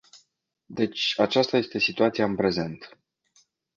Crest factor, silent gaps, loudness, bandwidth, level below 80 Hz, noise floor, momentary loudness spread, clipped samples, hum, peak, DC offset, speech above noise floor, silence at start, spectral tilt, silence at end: 20 dB; none; -24 LUFS; 7.6 kHz; -60 dBFS; -70 dBFS; 11 LU; under 0.1%; none; -8 dBFS; under 0.1%; 45 dB; 0.15 s; -5 dB/octave; 0.9 s